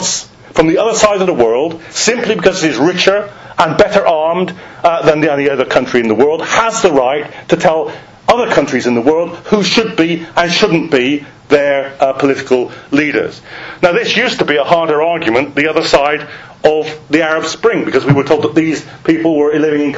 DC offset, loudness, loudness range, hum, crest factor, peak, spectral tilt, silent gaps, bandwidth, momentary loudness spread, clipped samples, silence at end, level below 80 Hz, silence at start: under 0.1%; -12 LUFS; 1 LU; none; 12 dB; 0 dBFS; -4 dB/octave; none; 8 kHz; 7 LU; 0.4%; 0 s; -44 dBFS; 0 s